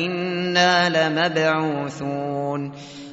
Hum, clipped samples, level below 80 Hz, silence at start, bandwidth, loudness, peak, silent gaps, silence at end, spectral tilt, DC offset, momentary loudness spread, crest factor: none; under 0.1%; -62 dBFS; 0 s; 8 kHz; -21 LUFS; -4 dBFS; none; 0 s; -3 dB/octave; under 0.1%; 11 LU; 18 dB